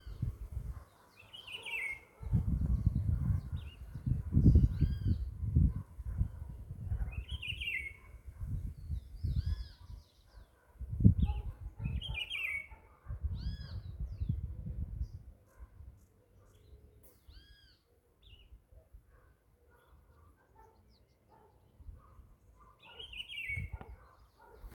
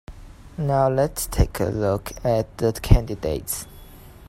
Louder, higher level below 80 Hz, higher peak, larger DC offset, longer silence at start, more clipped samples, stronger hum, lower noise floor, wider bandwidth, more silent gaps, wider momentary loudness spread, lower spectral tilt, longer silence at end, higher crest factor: second, -37 LUFS vs -23 LUFS; second, -42 dBFS vs -28 dBFS; second, -8 dBFS vs 0 dBFS; neither; about the same, 0.05 s vs 0.1 s; neither; neither; first, -69 dBFS vs -43 dBFS; second, 13.5 kHz vs 16 kHz; neither; first, 24 LU vs 9 LU; about the same, -7 dB/octave vs -6 dB/octave; second, 0 s vs 0.15 s; first, 28 dB vs 22 dB